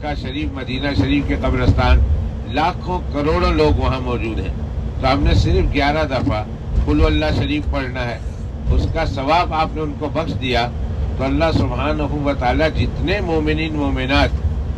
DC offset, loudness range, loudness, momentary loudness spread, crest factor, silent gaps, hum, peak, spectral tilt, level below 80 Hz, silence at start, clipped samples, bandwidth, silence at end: under 0.1%; 2 LU; -19 LUFS; 8 LU; 16 dB; none; none; 0 dBFS; -7 dB/octave; -22 dBFS; 0 s; under 0.1%; 8.2 kHz; 0 s